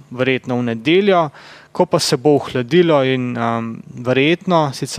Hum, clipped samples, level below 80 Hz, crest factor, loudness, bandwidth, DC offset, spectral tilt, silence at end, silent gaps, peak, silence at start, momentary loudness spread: none; under 0.1%; -60 dBFS; 16 dB; -16 LUFS; 15.5 kHz; under 0.1%; -5.5 dB/octave; 0 s; none; -2 dBFS; 0.1 s; 9 LU